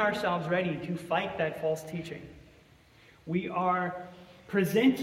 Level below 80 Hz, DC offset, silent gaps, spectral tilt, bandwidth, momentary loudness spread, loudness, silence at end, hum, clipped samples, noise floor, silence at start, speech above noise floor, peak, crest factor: -64 dBFS; under 0.1%; none; -6 dB/octave; 16 kHz; 17 LU; -30 LUFS; 0 s; none; under 0.1%; -59 dBFS; 0 s; 29 dB; -14 dBFS; 18 dB